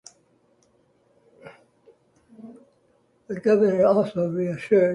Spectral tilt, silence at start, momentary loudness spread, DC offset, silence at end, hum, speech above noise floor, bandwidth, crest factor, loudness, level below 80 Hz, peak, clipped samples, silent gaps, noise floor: -8 dB/octave; 1.45 s; 20 LU; under 0.1%; 0 s; none; 43 dB; 11 kHz; 18 dB; -22 LUFS; -68 dBFS; -8 dBFS; under 0.1%; none; -64 dBFS